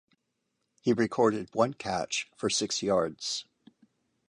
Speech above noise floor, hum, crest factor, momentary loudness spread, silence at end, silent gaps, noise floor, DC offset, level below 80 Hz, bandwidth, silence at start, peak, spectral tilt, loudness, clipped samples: 51 dB; none; 20 dB; 7 LU; 0.9 s; none; -80 dBFS; under 0.1%; -66 dBFS; 11.5 kHz; 0.85 s; -12 dBFS; -3.5 dB/octave; -29 LUFS; under 0.1%